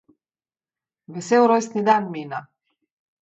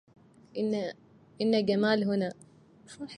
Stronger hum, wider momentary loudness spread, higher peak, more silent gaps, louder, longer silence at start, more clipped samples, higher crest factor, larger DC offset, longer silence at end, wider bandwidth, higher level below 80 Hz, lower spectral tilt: neither; first, 18 LU vs 13 LU; first, -4 dBFS vs -12 dBFS; neither; first, -20 LUFS vs -29 LUFS; first, 1.1 s vs 0.55 s; neither; about the same, 20 dB vs 18 dB; neither; first, 0.8 s vs 0 s; second, 8.2 kHz vs 10.5 kHz; about the same, -76 dBFS vs -72 dBFS; about the same, -5.5 dB/octave vs -6.5 dB/octave